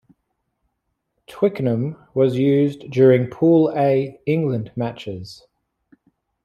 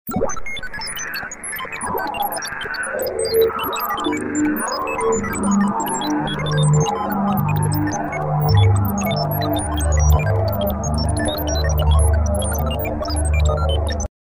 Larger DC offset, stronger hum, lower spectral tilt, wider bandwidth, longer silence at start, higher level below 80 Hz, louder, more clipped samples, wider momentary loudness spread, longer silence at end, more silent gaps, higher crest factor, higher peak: neither; neither; first, -9 dB/octave vs -5.5 dB/octave; second, 9.2 kHz vs 16.5 kHz; first, 1.3 s vs 0.05 s; second, -60 dBFS vs -26 dBFS; about the same, -19 LUFS vs -20 LUFS; neither; first, 12 LU vs 8 LU; first, 1.1 s vs 0.2 s; neither; about the same, 16 dB vs 14 dB; about the same, -4 dBFS vs -4 dBFS